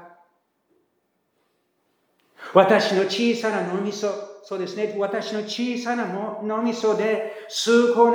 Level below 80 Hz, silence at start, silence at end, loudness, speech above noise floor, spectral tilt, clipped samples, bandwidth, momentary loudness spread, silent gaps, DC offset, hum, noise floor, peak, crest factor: -84 dBFS; 0 s; 0 s; -22 LUFS; 50 dB; -4.5 dB/octave; under 0.1%; 16.5 kHz; 11 LU; none; under 0.1%; none; -71 dBFS; -2 dBFS; 22 dB